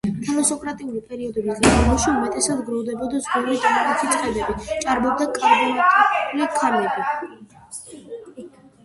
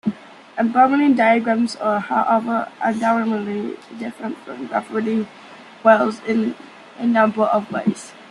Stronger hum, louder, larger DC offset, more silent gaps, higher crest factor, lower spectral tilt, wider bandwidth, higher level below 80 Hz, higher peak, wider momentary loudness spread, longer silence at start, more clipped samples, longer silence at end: neither; about the same, -20 LUFS vs -19 LUFS; neither; neither; about the same, 20 dB vs 18 dB; second, -4 dB/octave vs -6 dB/octave; about the same, 12 kHz vs 11 kHz; first, -36 dBFS vs -68 dBFS; about the same, -2 dBFS vs -2 dBFS; first, 19 LU vs 16 LU; about the same, 0.05 s vs 0.05 s; neither; first, 0.35 s vs 0.05 s